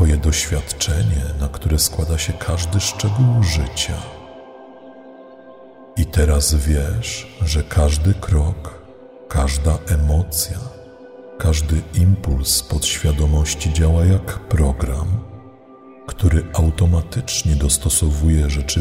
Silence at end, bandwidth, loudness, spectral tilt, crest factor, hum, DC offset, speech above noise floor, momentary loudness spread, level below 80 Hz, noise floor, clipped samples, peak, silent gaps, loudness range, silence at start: 0 s; 16 kHz; -18 LUFS; -4.5 dB/octave; 16 dB; none; under 0.1%; 25 dB; 9 LU; -22 dBFS; -42 dBFS; under 0.1%; -2 dBFS; none; 4 LU; 0 s